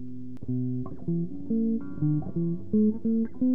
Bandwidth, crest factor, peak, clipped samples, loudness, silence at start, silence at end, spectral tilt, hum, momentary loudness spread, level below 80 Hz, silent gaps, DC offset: 2 kHz; 12 dB; -16 dBFS; under 0.1%; -29 LUFS; 0 s; 0 s; -13 dB/octave; none; 8 LU; -54 dBFS; none; 2%